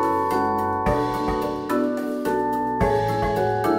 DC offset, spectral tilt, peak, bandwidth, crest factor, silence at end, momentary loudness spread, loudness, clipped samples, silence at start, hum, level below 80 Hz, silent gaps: under 0.1%; -7 dB/octave; -8 dBFS; 16 kHz; 14 dB; 0 s; 3 LU; -23 LUFS; under 0.1%; 0 s; none; -38 dBFS; none